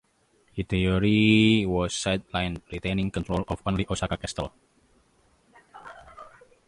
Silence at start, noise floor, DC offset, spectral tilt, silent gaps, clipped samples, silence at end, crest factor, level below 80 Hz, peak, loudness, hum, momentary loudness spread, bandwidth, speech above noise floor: 0.55 s; -65 dBFS; under 0.1%; -5.5 dB/octave; none; under 0.1%; 0.4 s; 20 dB; -44 dBFS; -8 dBFS; -25 LUFS; none; 22 LU; 11 kHz; 40 dB